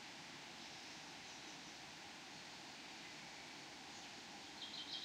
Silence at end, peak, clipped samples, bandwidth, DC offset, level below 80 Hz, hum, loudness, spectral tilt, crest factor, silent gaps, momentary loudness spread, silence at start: 0 s; -34 dBFS; under 0.1%; 15.5 kHz; under 0.1%; -82 dBFS; none; -52 LUFS; -1.5 dB/octave; 20 dB; none; 3 LU; 0 s